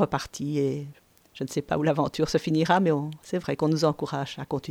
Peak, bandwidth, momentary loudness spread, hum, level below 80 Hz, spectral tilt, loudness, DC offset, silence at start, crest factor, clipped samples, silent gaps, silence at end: -8 dBFS; 16 kHz; 10 LU; none; -56 dBFS; -6 dB/octave; -27 LUFS; under 0.1%; 0 s; 18 dB; under 0.1%; none; 0 s